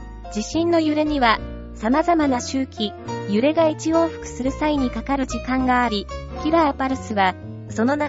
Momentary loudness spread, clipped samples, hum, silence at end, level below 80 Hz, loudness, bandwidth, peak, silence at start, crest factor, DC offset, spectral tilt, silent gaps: 9 LU; under 0.1%; none; 0 s; -38 dBFS; -21 LUFS; 8 kHz; -2 dBFS; 0 s; 20 dB; under 0.1%; -5 dB/octave; none